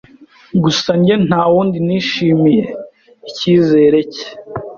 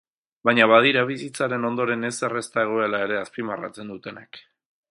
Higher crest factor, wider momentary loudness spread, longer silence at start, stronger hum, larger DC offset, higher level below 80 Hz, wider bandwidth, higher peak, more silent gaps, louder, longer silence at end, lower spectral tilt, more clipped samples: second, 14 dB vs 22 dB; second, 16 LU vs 20 LU; about the same, 0.55 s vs 0.45 s; neither; neither; first, -50 dBFS vs -70 dBFS; second, 7.2 kHz vs 11.5 kHz; about the same, 0 dBFS vs -2 dBFS; neither; first, -13 LUFS vs -22 LUFS; second, 0 s vs 0.5 s; first, -6.5 dB/octave vs -4.5 dB/octave; neither